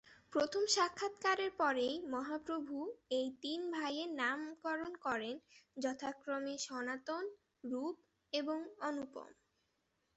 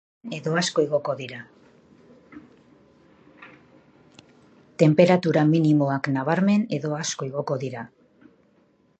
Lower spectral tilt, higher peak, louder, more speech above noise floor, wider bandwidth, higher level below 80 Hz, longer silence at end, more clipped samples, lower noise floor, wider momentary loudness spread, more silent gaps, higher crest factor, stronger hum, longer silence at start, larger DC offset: second, -1.5 dB/octave vs -6 dB/octave; second, -20 dBFS vs -4 dBFS; second, -39 LUFS vs -22 LUFS; about the same, 43 dB vs 40 dB; about the same, 8.2 kHz vs 8.8 kHz; second, -80 dBFS vs -70 dBFS; second, 0.85 s vs 1.15 s; neither; first, -82 dBFS vs -62 dBFS; second, 11 LU vs 18 LU; neither; about the same, 22 dB vs 22 dB; neither; second, 0.05 s vs 0.25 s; neither